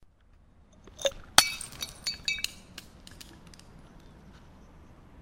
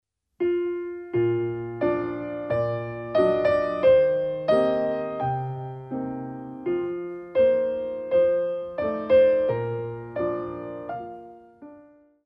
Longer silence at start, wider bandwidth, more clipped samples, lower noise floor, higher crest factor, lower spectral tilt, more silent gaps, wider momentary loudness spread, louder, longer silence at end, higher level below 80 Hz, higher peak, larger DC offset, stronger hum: first, 0.85 s vs 0.4 s; first, 17 kHz vs 5.6 kHz; neither; first, -59 dBFS vs -53 dBFS; first, 34 dB vs 16 dB; second, 0 dB/octave vs -9 dB/octave; neither; first, 27 LU vs 14 LU; second, -28 LUFS vs -25 LUFS; second, 0 s vs 0.45 s; about the same, -54 dBFS vs -56 dBFS; first, 0 dBFS vs -8 dBFS; neither; neither